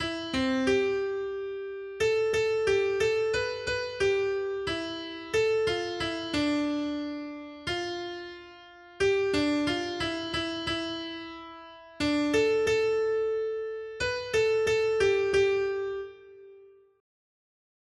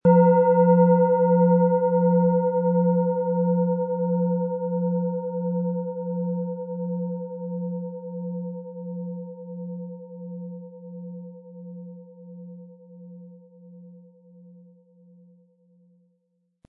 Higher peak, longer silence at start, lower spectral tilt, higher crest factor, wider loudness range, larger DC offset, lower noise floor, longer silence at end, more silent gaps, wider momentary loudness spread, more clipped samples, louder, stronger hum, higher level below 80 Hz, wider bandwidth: second, -14 dBFS vs -6 dBFS; about the same, 0 s vs 0.05 s; second, -4 dB/octave vs -15 dB/octave; about the same, 16 dB vs 18 dB; second, 4 LU vs 23 LU; neither; second, -54 dBFS vs -72 dBFS; second, 1.3 s vs 2.7 s; neither; second, 13 LU vs 24 LU; neither; second, -28 LUFS vs -23 LUFS; neither; first, -56 dBFS vs -70 dBFS; first, 12 kHz vs 2.1 kHz